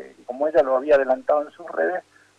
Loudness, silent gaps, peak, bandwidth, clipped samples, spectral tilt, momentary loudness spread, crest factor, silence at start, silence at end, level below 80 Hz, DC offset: -21 LUFS; none; -8 dBFS; 7.8 kHz; under 0.1%; -5.5 dB/octave; 12 LU; 14 dB; 0 s; 0.4 s; -62 dBFS; under 0.1%